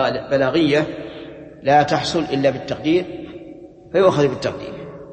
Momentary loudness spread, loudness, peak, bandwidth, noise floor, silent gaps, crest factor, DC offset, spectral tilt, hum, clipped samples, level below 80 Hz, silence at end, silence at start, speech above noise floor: 19 LU; -19 LUFS; -2 dBFS; 8.8 kHz; -39 dBFS; none; 18 dB; under 0.1%; -6 dB/octave; none; under 0.1%; -50 dBFS; 0 s; 0 s; 22 dB